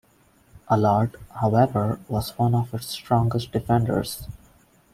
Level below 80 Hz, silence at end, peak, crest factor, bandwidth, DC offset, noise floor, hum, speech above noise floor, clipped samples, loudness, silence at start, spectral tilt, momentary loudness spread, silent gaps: -48 dBFS; 0.55 s; -6 dBFS; 18 dB; 15.5 kHz; under 0.1%; -59 dBFS; none; 36 dB; under 0.1%; -23 LUFS; 0.55 s; -7 dB/octave; 10 LU; none